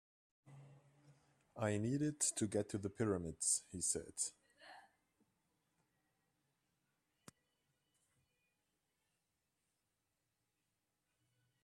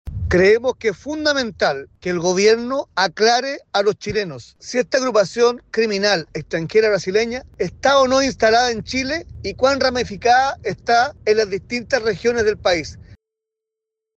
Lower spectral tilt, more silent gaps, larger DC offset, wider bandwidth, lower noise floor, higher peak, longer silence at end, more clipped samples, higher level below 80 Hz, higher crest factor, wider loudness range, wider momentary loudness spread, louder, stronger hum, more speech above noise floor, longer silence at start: about the same, -4 dB/octave vs -4 dB/octave; neither; neither; first, 14 kHz vs 8.4 kHz; first, -88 dBFS vs -83 dBFS; second, -22 dBFS vs -4 dBFS; first, 6.85 s vs 1.05 s; neither; second, -76 dBFS vs -44 dBFS; first, 24 dB vs 16 dB; first, 7 LU vs 2 LU; first, 19 LU vs 10 LU; second, -40 LUFS vs -18 LUFS; neither; second, 48 dB vs 65 dB; first, 0.45 s vs 0.05 s